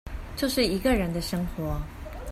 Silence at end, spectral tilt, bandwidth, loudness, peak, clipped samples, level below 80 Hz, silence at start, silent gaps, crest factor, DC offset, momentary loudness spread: 0 s; -5 dB/octave; 16 kHz; -27 LUFS; -10 dBFS; under 0.1%; -36 dBFS; 0.05 s; none; 18 dB; under 0.1%; 14 LU